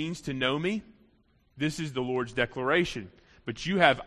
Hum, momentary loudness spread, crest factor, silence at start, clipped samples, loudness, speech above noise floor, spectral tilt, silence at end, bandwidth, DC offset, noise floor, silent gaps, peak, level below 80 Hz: none; 15 LU; 26 dB; 0 s; under 0.1%; -29 LUFS; 37 dB; -5 dB/octave; 0 s; 13 kHz; under 0.1%; -66 dBFS; none; -4 dBFS; -58 dBFS